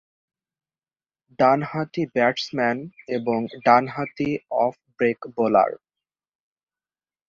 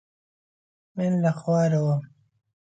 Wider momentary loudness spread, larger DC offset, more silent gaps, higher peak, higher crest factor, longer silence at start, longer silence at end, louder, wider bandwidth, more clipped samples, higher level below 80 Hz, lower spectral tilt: about the same, 9 LU vs 7 LU; neither; neither; first, -2 dBFS vs -12 dBFS; first, 22 dB vs 16 dB; first, 1.4 s vs 0.95 s; first, 1.5 s vs 0.65 s; about the same, -22 LUFS vs -24 LUFS; second, 7.4 kHz vs 8.8 kHz; neither; first, -64 dBFS vs -70 dBFS; second, -6.5 dB/octave vs -8.5 dB/octave